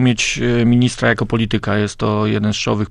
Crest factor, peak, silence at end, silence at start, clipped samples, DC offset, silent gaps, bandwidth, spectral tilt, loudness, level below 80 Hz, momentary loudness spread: 14 dB; -2 dBFS; 0 s; 0 s; under 0.1%; under 0.1%; none; 10.5 kHz; -5.5 dB/octave; -16 LUFS; -36 dBFS; 4 LU